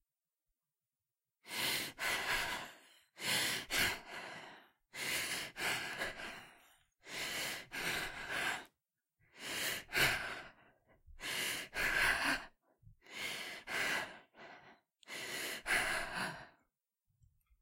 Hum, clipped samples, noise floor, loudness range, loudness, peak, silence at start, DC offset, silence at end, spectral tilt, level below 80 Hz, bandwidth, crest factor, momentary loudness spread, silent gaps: none; under 0.1%; under -90 dBFS; 5 LU; -37 LUFS; -18 dBFS; 1.45 s; under 0.1%; 1.1 s; -1 dB/octave; -62 dBFS; 16 kHz; 22 dB; 17 LU; none